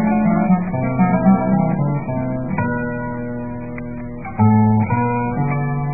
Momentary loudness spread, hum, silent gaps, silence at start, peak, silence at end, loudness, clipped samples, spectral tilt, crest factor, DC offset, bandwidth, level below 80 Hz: 13 LU; none; none; 0 s; -2 dBFS; 0 s; -18 LUFS; under 0.1%; -17 dB/octave; 16 dB; 1%; 2.6 kHz; -42 dBFS